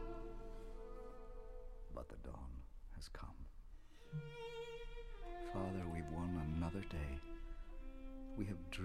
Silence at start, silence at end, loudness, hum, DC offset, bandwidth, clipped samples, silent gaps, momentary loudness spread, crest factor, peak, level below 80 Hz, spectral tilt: 0 s; 0 s; -50 LUFS; none; under 0.1%; 13 kHz; under 0.1%; none; 14 LU; 18 dB; -30 dBFS; -52 dBFS; -7 dB/octave